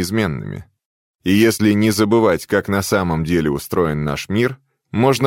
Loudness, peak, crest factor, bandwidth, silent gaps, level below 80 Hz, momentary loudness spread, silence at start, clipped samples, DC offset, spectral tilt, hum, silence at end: -18 LUFS; -2 dBFS; 16 dB; 17 kHz; 0.85-1.19 s; -42 dBFS; 12 LU; 0 s; under 0.1%; under 0.1%; -5.5 dB/octave; none; 0 s